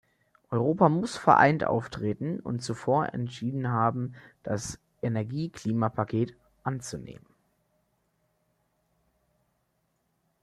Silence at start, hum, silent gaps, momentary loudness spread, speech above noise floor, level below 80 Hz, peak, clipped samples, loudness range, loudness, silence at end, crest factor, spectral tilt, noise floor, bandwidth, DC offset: 0.5 s; none; none; 14 LU; 48 dB; -62 dBFS; -4 dBFS; under 0.1%; 14 LU; -28 LUFS; 3.25 s; 24 dB; -6.5 dB/octave; -75 dBFS; 12.5 kHz; under 0.1%